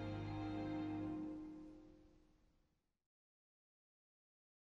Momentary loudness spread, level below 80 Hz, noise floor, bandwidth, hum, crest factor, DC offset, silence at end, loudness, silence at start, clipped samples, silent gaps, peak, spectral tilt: 16 LU; -66 dBFS; -82 dBFS; 7.2 kHz; none; 16 dB; under 0.1%; 2.4 s; -47 LUFS; 0 s; under 0.1%; none; -34 dBFS; -8.5 dB/octave